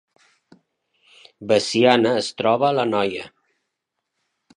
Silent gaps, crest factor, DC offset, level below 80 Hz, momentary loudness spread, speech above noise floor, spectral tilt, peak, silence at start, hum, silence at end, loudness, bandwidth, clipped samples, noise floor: none; 22 dB; under 0.1%; -66 dBFS; 17 LU; 60 dB; -4.5 dB/octave; 0 dBFS; 1.4 s; none; 1.3 s; -19 LUFS; 11 kHz; under 0.1%; -79 dBFS